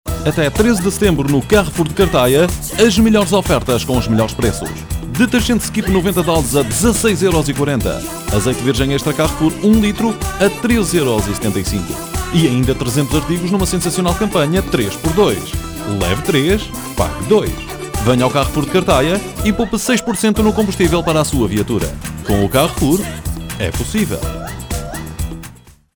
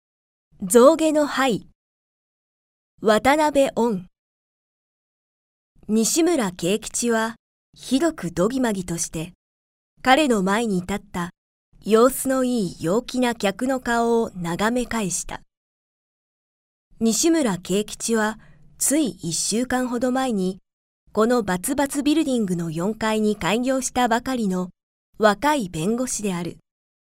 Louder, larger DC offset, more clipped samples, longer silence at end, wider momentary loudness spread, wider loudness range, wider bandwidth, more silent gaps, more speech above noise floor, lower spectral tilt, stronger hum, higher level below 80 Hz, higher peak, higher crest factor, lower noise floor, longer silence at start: first, -15 LUFS vs -21 LUFS; neither; neither; second, 0.25 s vs 0.55 s; about the same, 10 LU vs 11 LU; about the same, 3 LU vs 3 LU; first, over 20 kHz vs 16 kHz; second, none vs 1.75-2.98 s, 4.19-5.75 s, 7.39-7.73 s, 9.35-9.97 s, 11.38-11.72 s, 15.57-16.91 s, 20.73-21.07 s, 24.83-25.13 s; second, 24 dB vs over 69 dB; about the same, -5 dB/octave vs -4 dB/octave; neither; first, -28 dBFS vs -50 dBFS; about the same, 0 dBFS vs -2 dBFS; second, 14 dB vs 20 dB; second, -39 dBFS vs under -90 dBFS; second, 0.05 s vs 0.6 s